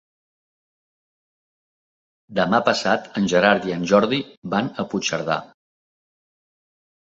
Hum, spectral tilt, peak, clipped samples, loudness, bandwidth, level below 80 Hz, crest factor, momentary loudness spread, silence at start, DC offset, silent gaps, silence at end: none; -4.5 dB/octave; -2 dBFS; under 0.1%; -21 LUFS; 7.8 kHz; -60 dBFS; 22 dB; 8 LU; 2.3 s; under 0.1%; 4.37-4.42 s; 1.55 s